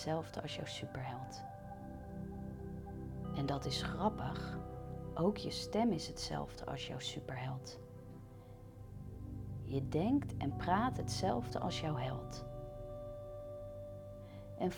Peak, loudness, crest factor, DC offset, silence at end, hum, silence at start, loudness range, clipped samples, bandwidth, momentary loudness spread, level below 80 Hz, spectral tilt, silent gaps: -20 dBFS; -41 LUFS; 20 dB; under 0.1%; 0 s; none; 0 s; 7 LU; under 0.1%; 18.5 kHz; 15 LU; -56 dBFS; -6 dB/octave; none